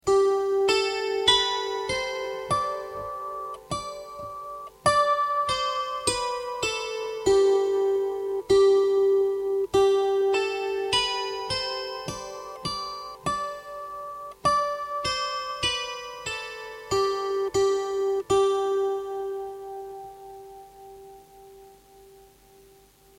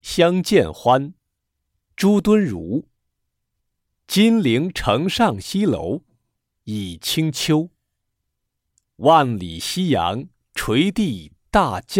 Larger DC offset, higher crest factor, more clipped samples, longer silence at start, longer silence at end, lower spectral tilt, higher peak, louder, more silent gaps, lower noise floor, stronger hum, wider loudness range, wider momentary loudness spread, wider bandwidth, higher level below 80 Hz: neither; about the same, 18 dB vs 18 dB; neither; about the same, 0.05 s vs 0.05 s; first, 1.15 s vs 0 s; second, -3 dB/octave vs -5.5 dB/octave; second, -8 dBFS vs -2 dBFS; second, -25 LUFS vs -19 LUFS; neither; second, -56 dBFS vs -77 dBFS; neither; first, 8 LU vs 4 LU; first, 16 LU vs 13 LU; about the same, 15.5 kHz vs 17 kHz; second, -54 dBFS vs -46 dBFS